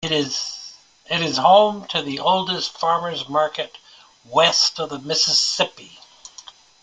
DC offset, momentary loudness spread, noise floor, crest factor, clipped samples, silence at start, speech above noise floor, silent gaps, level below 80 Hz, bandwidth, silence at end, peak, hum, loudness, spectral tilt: under 0.1%; 15 LU; -45 dBFS; 20 dB; under 0.1%; 0 s; 25 dB; none; -64 dBFS; 11 kHz; 0.35 s; 0 dBFS; none; -19 LUFS; -2.5 dB/octave